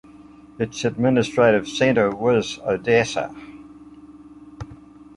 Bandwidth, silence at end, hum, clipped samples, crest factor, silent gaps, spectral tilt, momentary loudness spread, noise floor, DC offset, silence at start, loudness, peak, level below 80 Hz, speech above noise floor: 11.5 kHz; 0.15 s; none; under 0.1%; 20 dB; none; -5.5 dB/octave; 22 LU; -45 dBFS; under 0.1%; 0.2 s; -20 LUFS; -4 dBFS; -52 dBFS; 26 dB